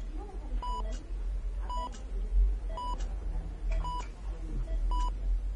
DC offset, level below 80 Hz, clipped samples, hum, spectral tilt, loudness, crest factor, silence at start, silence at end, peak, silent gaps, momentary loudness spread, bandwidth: under 0.1%; -32 dBFS; under 0.1%; none; -6 dB/octave; -37 LUFS; 14 dB; 0 s; 0 s; -18 dBFS; none; 8 LU; 8 kHz